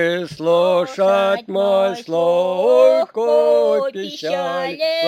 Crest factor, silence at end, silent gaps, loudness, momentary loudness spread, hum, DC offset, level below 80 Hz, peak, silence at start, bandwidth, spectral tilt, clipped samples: 14 dB; 0 s; none; -17 LUFS; 9 LU; none; under 0.1%; -68 dBFS; -2 dBFS; 0 s; 16 kHz; -5 dB/octave; under 0.1%